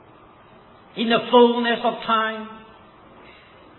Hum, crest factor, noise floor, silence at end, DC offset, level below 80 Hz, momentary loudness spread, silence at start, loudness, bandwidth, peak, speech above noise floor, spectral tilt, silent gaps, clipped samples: none; 20 dB; -49 dBFS; 1.15 s; under 0.1%; -64 dBFS; 19 LU; 0.95 s; -19 LUFS; 4.2 kHz; -4 dBFS; 30 dB; -7.5 dB/octave; none; under 0.1%